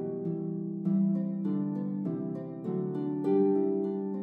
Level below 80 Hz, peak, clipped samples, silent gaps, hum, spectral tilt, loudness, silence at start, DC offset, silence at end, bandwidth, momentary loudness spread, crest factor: -82 dBFS; -18 dBFS; under 0.1%; none; none; -12 dB/octave; -31 LUFS; 0 s; under 0.1%; 0 s; 3.7 kHz; 8 LU; 12 dB